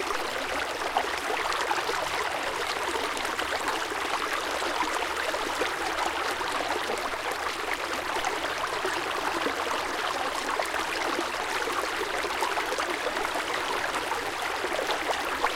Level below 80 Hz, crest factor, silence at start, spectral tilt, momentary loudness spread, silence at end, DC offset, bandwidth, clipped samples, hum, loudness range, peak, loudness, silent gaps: -54 dBFS; 18 dB; 0 s; -1.5 dB/octave; 2 LU; 0 s; under 0.1%; 16.5 kHz; under 0.1%; none; 1 LU; -10 dBFS; -28 LUFS; none